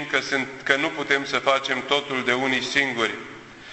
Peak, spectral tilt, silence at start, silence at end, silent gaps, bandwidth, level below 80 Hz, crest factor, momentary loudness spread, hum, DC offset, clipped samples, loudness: -2 dBFS; -3 dB/octave; 0 s; 0 s; none; 8.4 kHz; -62 dBFS; 22 dB; 5 LU; none; under 0.1%; under 0.1%; -22 LUFS